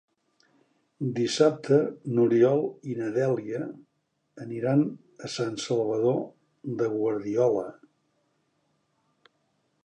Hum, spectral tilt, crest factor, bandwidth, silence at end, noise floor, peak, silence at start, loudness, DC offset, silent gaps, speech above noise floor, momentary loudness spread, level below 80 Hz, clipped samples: none; -6.5 dB/octave; 20 dB; 10 kHz; 2.15 s; -73 dBFS; -8 dBFS; 1 s; -26 LUFS; under 0.1%; none; 47 dB; 15 LU; -74 dBFS; under 0.1%